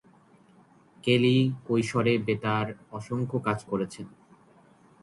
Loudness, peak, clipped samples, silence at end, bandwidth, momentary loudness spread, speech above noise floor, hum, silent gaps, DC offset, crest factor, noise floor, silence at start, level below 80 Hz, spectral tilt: -27 LUFS; -10 dBFS; under 0.1%; 0.95 s; 11.5 kHz; 13 LU; 32 dB; none; none; under 0.1%; 18 dB; -58 dBFS; 1.05 s; -62 dBFS; -6.5 dB/octave